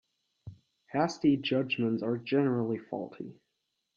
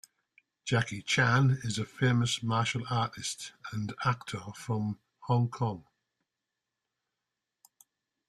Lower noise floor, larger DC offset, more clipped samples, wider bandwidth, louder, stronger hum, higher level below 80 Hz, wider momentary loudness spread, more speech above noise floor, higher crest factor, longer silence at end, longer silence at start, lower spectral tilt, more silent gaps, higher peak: second, -82 dBFS vs -88 dBFS; neither; neither; second, 7.4 kHz vs 12.5 kHz; about the same, -30 LUFS vs -31 LUFS; neither; second, -70 dBFS vs -64 dBFS; about the same, 13 LU vs 14 LU; second, 52 dB vs 58 dB; about the same, 18 dB vs 20 dB; second, 0.65 s vs 2.5 s; second, 0.45 s vs 0.65 s; first, -6.5 dB/octave vs -5 dB/octave; neither; about the same, -14 dBFS vs -12 dBFS